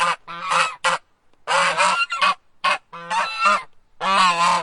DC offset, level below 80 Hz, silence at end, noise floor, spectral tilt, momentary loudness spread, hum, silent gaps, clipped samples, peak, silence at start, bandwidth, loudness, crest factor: under 0.1%; -62 dBFS; 0 s; -52 dBFS; -1 dB/octave; 9 LU; none; none; under 0.1%; -2 dBFS; 0 s; 11.5 kHz; -20 LUFS; 18 dB